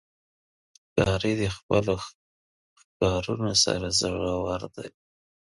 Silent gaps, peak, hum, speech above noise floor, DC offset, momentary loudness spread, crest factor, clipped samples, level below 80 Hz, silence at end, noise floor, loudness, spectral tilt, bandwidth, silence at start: 1.63-1.69 s, 2.15-2.76 s, 2.84-3.00 s; -6 dBFS; none; over 64 dB; under 0.1%; 14 LU; 22 dB; under 0.1%; -46 dBFS; 0.6 s; under -90 dBFS; -26 LUFS; -4 dB/octave; 11.5 kHz; 0.95 s